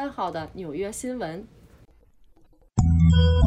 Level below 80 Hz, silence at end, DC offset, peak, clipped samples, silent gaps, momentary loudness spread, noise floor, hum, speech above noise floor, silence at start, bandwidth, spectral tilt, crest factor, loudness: -32 dBFS; 0 s; under 0.1%; -8 dBFS; under 0.1%; none; 16 LU; -55 dBFS; none; 24 dB; 0 s; 11.5 kHz; -7 dB/octave; 16 dB; -24 LUFS